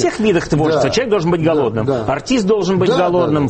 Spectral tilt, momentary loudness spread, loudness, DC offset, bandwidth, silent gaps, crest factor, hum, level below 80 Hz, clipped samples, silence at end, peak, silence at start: -6 dB/octave; 3 LU; -15 LUFS; under 0.1%; 8.8 kHz; none; 12 dB; none; -40 dBFS; under 0.1%; 0 s; -2 dBFS; 0 s